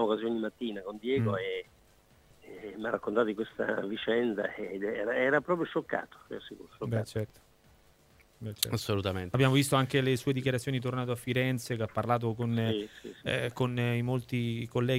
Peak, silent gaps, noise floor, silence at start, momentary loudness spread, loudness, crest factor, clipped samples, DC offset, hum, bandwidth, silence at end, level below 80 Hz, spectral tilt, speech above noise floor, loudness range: -8 dBFS; none; -62 dBFS; 0 s; 13 LU; -31 LUFS; 24 dB; under 0.1%; under 0.1%; none; 16 kHz; 0 s; -64 dBFS; -5.5 dB/octave; 31 dB; 5 LU